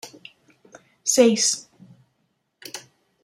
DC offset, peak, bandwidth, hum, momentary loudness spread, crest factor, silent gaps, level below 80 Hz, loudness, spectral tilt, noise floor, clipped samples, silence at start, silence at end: under 0.1%; -2 dBFS; 16 kHz; none; 24 LU; 22 dB; none; -74 dBFS; -19 LUFS; -2 dB/octave; -72 dBFS; under 0.1%; 0.05 s; 0.45 s